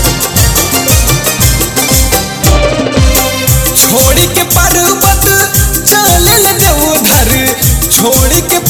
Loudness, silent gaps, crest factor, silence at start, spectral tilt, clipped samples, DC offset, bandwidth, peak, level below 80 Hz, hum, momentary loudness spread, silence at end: -7 LUFS; none; 8 dB; 0 s; -3 dB/octave; 1%; under 0.1%; over 20 kHz; 0 dBFS; -16 dBFS; none; 4 LU; 0 s